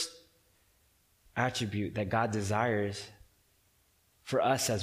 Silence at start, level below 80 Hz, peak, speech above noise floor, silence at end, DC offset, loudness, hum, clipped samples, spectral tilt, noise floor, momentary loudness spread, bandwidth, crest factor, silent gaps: 0 s; -64 dBFS; -14 dBFS; 39 dB; 0 s; under 0.1%; -32 LUFS; none; under 0.1%; -4.5 dB/octave; -70 dBFS; 12 LU; 15.5 kHz; 20 dB; none